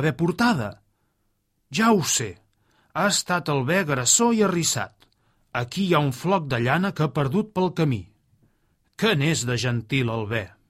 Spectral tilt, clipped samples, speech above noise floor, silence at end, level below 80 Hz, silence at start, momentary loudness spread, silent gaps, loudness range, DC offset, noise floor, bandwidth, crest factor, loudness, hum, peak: -4 dB/octave; under 0.1%; 49 dB; 0.25 s; -56 dBFS; 0 s; 10 LU; none; 3 LU; under 0.1%; -71 dBFS; 16 kHz; 20 dB; -23 LUFS; none; -4 dBFS